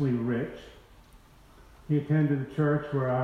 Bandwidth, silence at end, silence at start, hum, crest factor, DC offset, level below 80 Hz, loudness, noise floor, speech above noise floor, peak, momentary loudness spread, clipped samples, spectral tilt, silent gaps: 6 kHz; 0 s; 0 s; none; 14 dB; under 0.1%; -56 dBFS; -28 LUFS; -55 dBFS; 28 dB; -14 dBFS; 8 LU; under 0.1%; -9.5 dB/octave; none